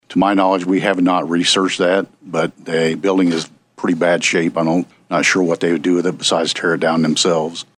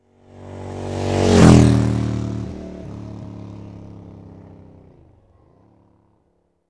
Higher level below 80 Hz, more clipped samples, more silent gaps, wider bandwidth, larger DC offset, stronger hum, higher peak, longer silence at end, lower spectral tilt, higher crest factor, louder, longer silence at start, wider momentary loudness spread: second, -64 dBFS vs -34 dBFS; neither; neither; about the same, 11.5 kHz vs 11 kHz; neither; neither; about the same, 0 dBFS vs 0 dBFS; second, 0.15 s vs 2.95 s; second, -4 dB/octave vs -7 dB/octave; about the same, 16 dB vs 20 dB; about the same, -16 LUFS vs -15 LUFS; second, 0.1 s vs 0.4 s; second, 7 LU vs 28 LU